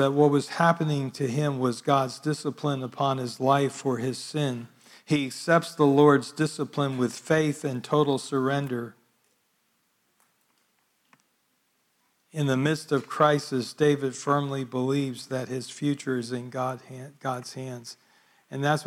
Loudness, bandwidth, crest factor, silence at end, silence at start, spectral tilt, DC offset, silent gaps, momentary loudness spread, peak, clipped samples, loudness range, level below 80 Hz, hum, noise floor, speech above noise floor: -26 LUFS; 15 kHz; 20 dB; 0 s; 0 s; -6 dB/octave; under 0.1%; none; 12 LU; -6 dBFS; under 0.1%; 8 LU; -74 dBFS; none; -71 dBFS; 46 dB